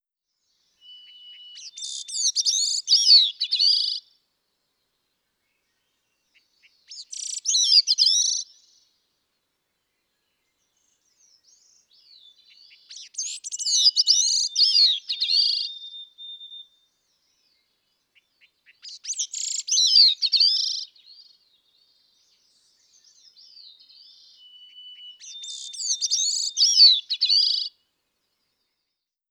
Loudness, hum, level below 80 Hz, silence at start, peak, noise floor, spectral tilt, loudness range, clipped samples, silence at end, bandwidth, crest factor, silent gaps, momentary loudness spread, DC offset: -18 LUFS; none; under -90 dBFS; 0.9 s; -6 dBFS; -82 dBFS; 8.5 dB/octave; 15 LU; under 0.1%; 1.6 s; 18 kHz; 20 dB; none; 25 LU; under 0.1%